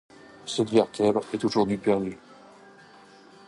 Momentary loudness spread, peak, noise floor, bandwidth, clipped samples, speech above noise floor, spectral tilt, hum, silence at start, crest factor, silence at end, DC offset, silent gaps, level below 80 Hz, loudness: 12 LU; -8 dBFS; -52 dBFS; 11.5 kHz; under 0.1%; 27 dB; -5.5 dB/octave; none; 0.45 s; 20 dB; 1.15 s; under 0.1%; none; -62 dBFS; -25 LUFS